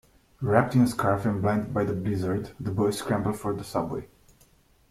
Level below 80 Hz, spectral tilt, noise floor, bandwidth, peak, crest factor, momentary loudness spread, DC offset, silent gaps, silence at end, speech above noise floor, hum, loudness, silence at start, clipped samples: -54 dBFS; -7 dB/octave; -60 dBFS; 15.5 kHz; -6 dBFS; 20 dB; 9 LU; under 0.1%; none; 0.85 s; 35 dB; none; -27 LUFS; 0.4 s; under 0.1%